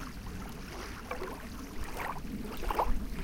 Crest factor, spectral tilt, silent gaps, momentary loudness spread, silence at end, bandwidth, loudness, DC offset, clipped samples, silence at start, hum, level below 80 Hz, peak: 20 dB; -5 dB/octave; none; 10 LU; 0 s; 17 kHz; -39 LUFS; under 0.1%; under 0.1%; 0 s; none; -40 dBFS; -16 dBFS